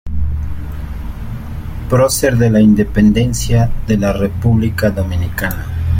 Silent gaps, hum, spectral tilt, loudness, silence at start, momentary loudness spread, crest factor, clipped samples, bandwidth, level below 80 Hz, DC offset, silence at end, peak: none; none; -6.5 dB/octave; -14 LUFS; 0.05 s; 15 LU; 12 dB; under 0.1%; 16.5 kHz; -24 dBFS; under 0.1%; 0 s; -2 dBFS